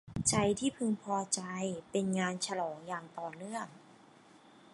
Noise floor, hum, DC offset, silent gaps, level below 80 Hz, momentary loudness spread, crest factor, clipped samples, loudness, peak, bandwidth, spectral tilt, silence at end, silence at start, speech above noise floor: -60 dBFS; none; under 0.1%; none; -64 dBFS; 12 LU; 22 dB; under 0.1%; -35 LUFS; -14 dBFS; 11.5 kHz; -4 dB/octave; 0.35 s; 0.05 s; 25 dB